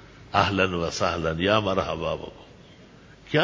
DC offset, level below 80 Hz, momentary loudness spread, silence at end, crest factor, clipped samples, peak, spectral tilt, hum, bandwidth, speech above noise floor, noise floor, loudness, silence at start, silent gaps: under 0.1%; -44 dBFS; 9 LU; 0 s; 24 dB; under 0.1%; -2 dBFS; -5 dB/octave; none; 7.6 kHz; 25 dB; -50 dBFS; -25 LUFS; 0 s; none